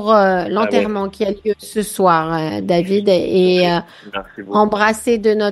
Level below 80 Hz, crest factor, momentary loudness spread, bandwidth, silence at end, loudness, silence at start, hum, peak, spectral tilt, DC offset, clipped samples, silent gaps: -50 dBFS; 16 dB; 9 LU; 12.5 kHz; 0 s; -16 LUFS; 0 s; none; 0 dBFS; -5.5 dB/octave; under 0.1%; under 0.1%; none